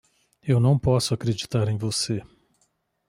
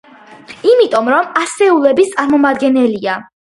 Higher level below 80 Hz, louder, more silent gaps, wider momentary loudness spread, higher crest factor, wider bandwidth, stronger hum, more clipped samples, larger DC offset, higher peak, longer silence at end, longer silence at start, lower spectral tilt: first, -50 dBFS vs -58 dBFS; second, -24 LUFS vs -12 LUFS; neither; about the same, 8 LU vs 6 LU; about the same, 16 dB vs 12 dB; first, 15 kHz vs 11.5 kHz; neither; neither; neither; second, -8 dBFS vs 0 dBFS; first, 0.85 s vs 0.2 s; about the same, 0.45 s vs 0.5 s; first, -5.5 dB/octave vs -4 dB/octave